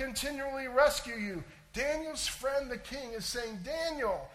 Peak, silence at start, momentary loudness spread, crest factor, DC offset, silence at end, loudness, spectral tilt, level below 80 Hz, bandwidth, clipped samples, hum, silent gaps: -14 dBFS; 0 s; 12 LU; 20 dB; under 0.1%; 0 s; -34 LUFS; -2.5 dB/octave; -52 dBFS; 16 kHz; under 0.1%; none; none